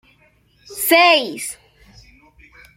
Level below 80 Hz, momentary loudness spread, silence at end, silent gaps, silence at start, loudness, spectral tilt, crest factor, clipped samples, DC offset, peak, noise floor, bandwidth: -56 dBFS; 24 LU; 1.25 s; none; 0.7 s; -15 LUFS; -1 dB/octave; 20 dB; under 0.1%; under 0.1%; 0 dBFS; -56 dBFS; 16.5 kHz